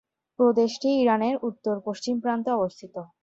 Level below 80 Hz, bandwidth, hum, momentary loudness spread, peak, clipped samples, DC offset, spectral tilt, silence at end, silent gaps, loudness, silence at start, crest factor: -68 dBFS; 7.8 kHz; none; 9 LU; -8 dBFS; under 0.1%; under 0.1%; -5.5 dB/octave; 0.2 s; none; -25 LUFS; 0.4 s; 16 dB